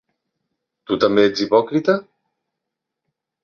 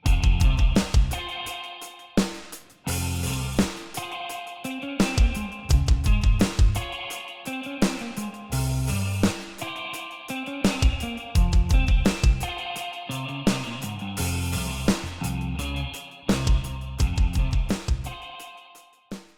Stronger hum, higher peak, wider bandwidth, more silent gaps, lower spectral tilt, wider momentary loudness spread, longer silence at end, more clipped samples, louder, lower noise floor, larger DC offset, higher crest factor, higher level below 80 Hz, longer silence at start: neither; first, -2 dBFS vs -8 dBFS; second, 7 kHz vs 17 kHz; neither; about the same, -6 dB/octave vs -5 dB/octave; second, 7 LU vs 12 LU; first, 1.4 s vs 0.15 s; neither; first, -18 LUFS vs -26 LUFS; first, -82 dBFS vs -51 dBFS; neither; about the same, 20 dB vs 16 dB; second, -62 dBFS vs -26 dBFS; first, 0.9 s vs 0.05 s